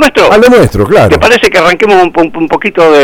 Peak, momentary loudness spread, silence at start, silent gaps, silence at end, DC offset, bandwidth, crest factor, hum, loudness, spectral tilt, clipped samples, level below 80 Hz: 0 dBFS; 7 LU; 0 s; none; 0 s; under 0.1%; 17.5 kHz; 4 dB; none; -5 LUFS; -5 dB/octave; 3%; -28 dBFS